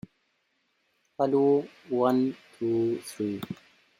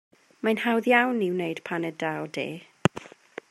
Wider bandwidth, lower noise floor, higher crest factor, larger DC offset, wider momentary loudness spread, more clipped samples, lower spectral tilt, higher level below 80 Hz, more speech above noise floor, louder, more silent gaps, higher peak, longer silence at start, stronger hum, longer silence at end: first, 16 kHz vs 13.5 kHz; first, -74 dBFS vs -45 dBFS; second, 18 dB vs 26 dB; neither; second, 11 LU vs 14 LU; neither; about the same, -7 dB/octave vs -6 dB/octave; second, -74 dBFS vs -66 dBFS; first, 47 dB vs 19 dB; about the same, -28 LUFS vs -26 LUFS; neither; second, -12 dBFS vs 0 dBFS; first, 1.2 s vs 0.45 s; neither; about the same, 0.45 s vs 0.45 s